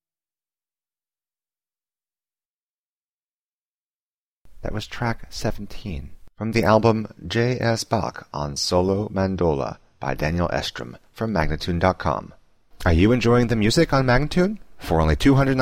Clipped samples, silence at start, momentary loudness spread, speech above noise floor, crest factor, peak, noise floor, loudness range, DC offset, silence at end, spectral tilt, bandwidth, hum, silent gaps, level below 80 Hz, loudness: under 0.1%; 4.5 s; 14 LU; over 69 dB; 20 dB; -4 dBFS; under -90 dBFS; 12 LU; under 0.1%; 0 s; -6 dB/octave; 16 kHz; none; none; -36 dBFS; -22 LUFS